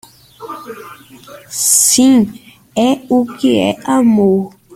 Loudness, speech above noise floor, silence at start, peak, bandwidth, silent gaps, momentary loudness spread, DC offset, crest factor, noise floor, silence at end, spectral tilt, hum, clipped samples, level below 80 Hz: -12 LUFS; 19 dB; 0.4 s; 0 dBFS; 16 kHz; none; 21 LU; under 0.1%; 14 dB; -32 dBFS; 0.25 s; -3.5 dB/octave; none; under 0.1%; -54 dBFS